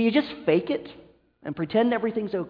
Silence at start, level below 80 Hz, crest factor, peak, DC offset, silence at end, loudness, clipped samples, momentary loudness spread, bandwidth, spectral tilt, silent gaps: 0 s; -64 dBFS; 16 dB; -8 dBFS; under 0.1%; 0 s; -25 LUFS; under 0.1%; 15 LU; 5.2 kHz; -9 dB/octave; none